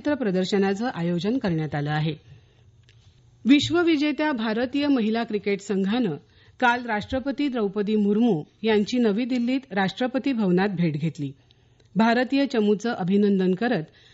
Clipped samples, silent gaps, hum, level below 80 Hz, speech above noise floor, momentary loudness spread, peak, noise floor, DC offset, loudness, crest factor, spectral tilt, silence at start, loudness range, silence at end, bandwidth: under 0.1%; none; none; -60 dBFS; 32 dB; 6 LU; -8 dBFS; -55 dBFS; under 0.1%; -24 LUFS; 16 dB; -6.5 dB/octave; 0.05 s; 2 LU; 0.3 s; 8 kHz